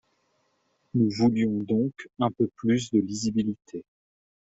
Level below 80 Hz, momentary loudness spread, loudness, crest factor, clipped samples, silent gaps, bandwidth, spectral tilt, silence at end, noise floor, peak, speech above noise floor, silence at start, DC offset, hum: -62 dBFS; 9 LU; -26 LUFS; 16 dB; under 0.1%; none; 8 kHz; -6.5 dB/octave; 0.7 s; -71 dBFS; -10 dBFS; 46 dB; 0.95 s; under 0.1%; none